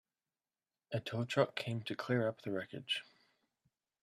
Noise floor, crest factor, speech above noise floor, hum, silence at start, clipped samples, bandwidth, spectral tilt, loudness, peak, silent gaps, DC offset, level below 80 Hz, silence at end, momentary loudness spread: under -90 dBFS; 24 dB; over 52 dB; none; 0.9 s; under 0.1%; 13.5 kHz; -6 dB/octave; -38 LUFS; -16 dBFS; none; under 0.1%; -78 dBFS; 1 s; 8 LU